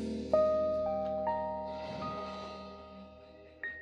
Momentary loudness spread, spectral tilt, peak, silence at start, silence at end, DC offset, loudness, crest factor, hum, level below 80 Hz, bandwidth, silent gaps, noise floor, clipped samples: 22 LU; -6.5 dB/octave; -16 dBFS; 0 s; 0 s; under 0.1%; -34 LUFS; 20 dB; none; -58 dBFS; 9 kHz; none; -54 dBFS; under 0.1%